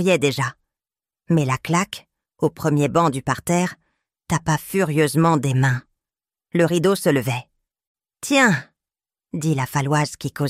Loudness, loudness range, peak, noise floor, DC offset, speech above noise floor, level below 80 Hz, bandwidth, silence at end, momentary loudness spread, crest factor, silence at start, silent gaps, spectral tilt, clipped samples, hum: -20 LUFS; 2 LU; -4 dBFS; under -90 dBFS; under 0.1%; over 71 dB; -54 dBFS; 16 kHz; 0 s; 9 LU; 18 dB; 0 s; 7.87-7.95 s; -5.5 dB/octave; under 0.1%; none